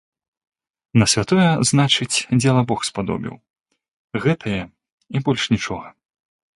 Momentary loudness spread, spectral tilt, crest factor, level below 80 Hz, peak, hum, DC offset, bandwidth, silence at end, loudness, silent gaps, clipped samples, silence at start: 12 LU; -4.5 dB/octave; 18 dB; -50 dBFS; -2 dBFS; none; under 0.1%; 11.5 kHz; 0.65 s; -19 LUFS; 3.50-3.54 s, 3.88-4.08 s, 4.92-4.98 s; under 0.1%; 0.95 s